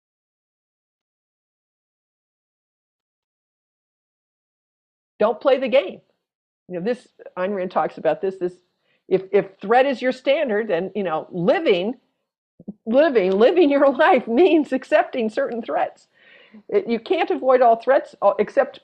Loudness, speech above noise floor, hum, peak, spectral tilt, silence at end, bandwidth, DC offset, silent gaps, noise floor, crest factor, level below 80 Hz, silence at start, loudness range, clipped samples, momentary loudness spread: -20 LUFS; over 71 dB; none; -4 dBFS; -7 dB/octave; 0.05 s; 8.6 kHz; under 0.1%; 6.35-6.66 s, 12.38-12.58 s; under -90 dBFS; 16 dB; -70 dBFS; 5.2 s; 7 LU; under 0.1%; 11 LU